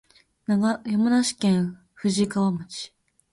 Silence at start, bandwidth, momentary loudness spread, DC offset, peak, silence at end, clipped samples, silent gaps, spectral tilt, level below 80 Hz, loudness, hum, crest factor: 0.5 s; 11.5 kHz; 15 LU; under 0.1%; -12 dBFS; 0.45 s; under 0.1%; none; -5.5 dB/octave; -62 dBFS; -24 LUFS; none; 12 dB